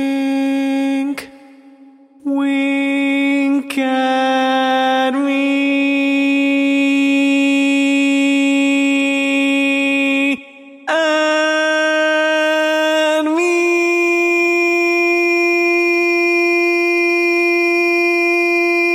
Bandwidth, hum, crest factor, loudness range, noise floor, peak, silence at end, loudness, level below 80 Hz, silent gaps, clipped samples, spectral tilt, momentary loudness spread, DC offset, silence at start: 15.5 kHz; none; 12 dB; 3 LU; -44 dBFS; -4 dBFS; 0 s; -14 LUFS; -74 dBFS; none; under 0.1%; -2.5 dB/octave; 4 LU; under 0.1%; 0 s